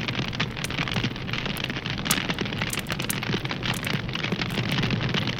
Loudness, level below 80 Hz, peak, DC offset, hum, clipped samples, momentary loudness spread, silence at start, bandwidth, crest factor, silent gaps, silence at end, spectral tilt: -27 LUFS; -44 dBFS; -4 dBFS; under 0.1%; none; under 0.1%; 4 LU; 0 s; 17 kHz; 24 dB; none; 0 s; -4 dB/octave